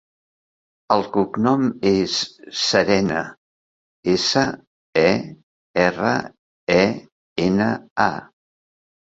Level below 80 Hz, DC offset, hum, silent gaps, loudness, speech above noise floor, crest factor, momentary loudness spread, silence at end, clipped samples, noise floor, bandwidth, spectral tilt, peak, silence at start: -52 dBFS; under 0.1%; none; 3.38-4.03 s, 4.67-4.93 s, 5.43-5.74 s, 6.39-6.67 s, 7.12-7.36 s, 7.91-7.96 s; -20 LUFS; over 71 dB; 20 dB; 14 LU; 0.95 s; under 0.1%; under -90 dBFS; 8 kHz; -4.5 dB/octave; -2 dBFS; 0.9 s